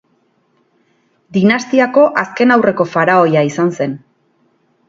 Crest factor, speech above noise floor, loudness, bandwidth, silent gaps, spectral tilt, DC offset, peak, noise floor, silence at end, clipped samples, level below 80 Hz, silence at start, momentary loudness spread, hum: 14 dB; 47 dB; -13 LUFS; 7.6 kHz; none; -6.5 dB/octave; under 0.1%; 0 dBFS; -59 dBFS; 0.9 s; under 0.1%; -60 dBFS; 1.3 s; 10 LU; none